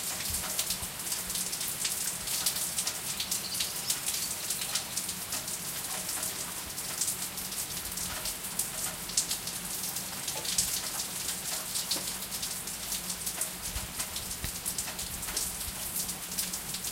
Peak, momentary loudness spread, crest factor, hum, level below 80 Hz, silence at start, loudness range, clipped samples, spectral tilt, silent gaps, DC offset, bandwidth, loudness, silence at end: -8 dBFS; 4 LU; 26 dB; none; -54 dBFS; 0 s; 3 LU; under 0.1%; -0.5 dB/octave; none; under 0.1%; 17 kHz; -32 LUFS; 0 s